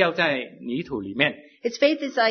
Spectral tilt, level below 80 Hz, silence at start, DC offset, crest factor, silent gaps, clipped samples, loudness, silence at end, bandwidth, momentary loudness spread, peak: -4.5 dB/octave; -64 dBFS; 0 s; under 0.1%; 20 dB; none; under 0.1%; -24 LUFS; 0 s; 6.6 kHz; 10 LU; -4 dBFS